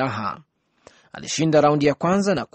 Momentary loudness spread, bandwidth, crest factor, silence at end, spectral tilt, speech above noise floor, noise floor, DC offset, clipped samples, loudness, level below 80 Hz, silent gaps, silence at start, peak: 16 LU; 8.8 kHz; 16 dB; 0.1 s; -5.5 dB/octave; 34 dB; -54 dBFS; under 0.1%; under 0.1%; -20 LUFS; -58 dBFS; none; 0 s; -6 dBFS